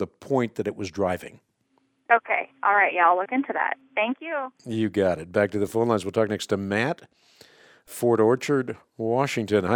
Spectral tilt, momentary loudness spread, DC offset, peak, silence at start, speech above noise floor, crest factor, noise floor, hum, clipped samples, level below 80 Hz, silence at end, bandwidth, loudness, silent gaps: -6 dB/octave; 11 LU; under 0.1%; -6 dBFS; 0 s; 44 dB; 18 dB; -69 dBFS; none; under 0.1%; -64 dBFS; 0 s; 19 kHz; -24 LUFS; none